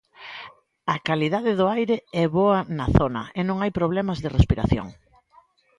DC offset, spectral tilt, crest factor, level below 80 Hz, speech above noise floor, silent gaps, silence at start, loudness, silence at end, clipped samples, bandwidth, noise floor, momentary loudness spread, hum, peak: under 0.1%; -8 dB/octave; 22 dB; -36 dBFS; 36 dB; none; 0.2 s; -23 LUFS; 0.85 s; under 0.1%; 11 kHz; -58 dBFS; 17 LU; none; -2 dBFS